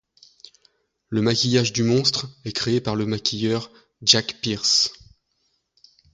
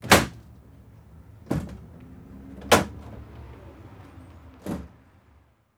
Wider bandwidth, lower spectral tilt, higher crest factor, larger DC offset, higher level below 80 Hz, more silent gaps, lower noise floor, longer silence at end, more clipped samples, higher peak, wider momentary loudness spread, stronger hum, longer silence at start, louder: second, 9.6 kHz vs over 20 kHz; about the same, -3.5 dB/octave vs -3.5 dB/octave; about the same, 24 dB vs 26 dB; neither; second, -56 dBFS vs -46 dBFS; neither; first, -71 dBFS vs -59 dBFS; first, 1.2 s vs 0.9 s; neither; about the same, 0 dBFS vs -2 dBFS; second, 10 LU vs 26 LU; neither; first, 1.1 s vs 0.05 s; first, -21 LUFS vs -24 LUFS